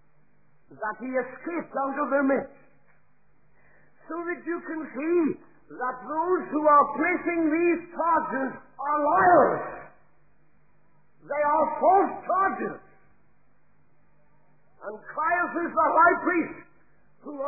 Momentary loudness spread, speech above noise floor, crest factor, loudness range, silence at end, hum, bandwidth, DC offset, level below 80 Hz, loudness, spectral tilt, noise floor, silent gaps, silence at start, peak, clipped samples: 16 LU; 42 dB; 18 dB; 8 LU; 0 s; none; 2.6 kHz; 0.2%; -66 dBFS; -25 LUFS; -12.5 dB/octave; -67 dBFS; none; 0.7 s; -8 dBFS; under 0.1%